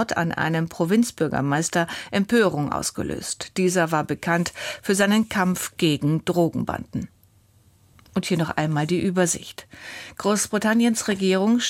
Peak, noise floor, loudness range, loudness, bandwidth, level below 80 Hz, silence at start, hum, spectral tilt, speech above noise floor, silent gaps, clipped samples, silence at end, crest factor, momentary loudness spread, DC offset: -6 dBFS; -57 dBFS; 3 LU; -23 LUFS; 16.5 kHz; -54 dBFS; 0 s; none; -4.5 dB/octave; 35 dB; none; under 0.1%; 0 s; 16 dB; 10 LU; under 0.1%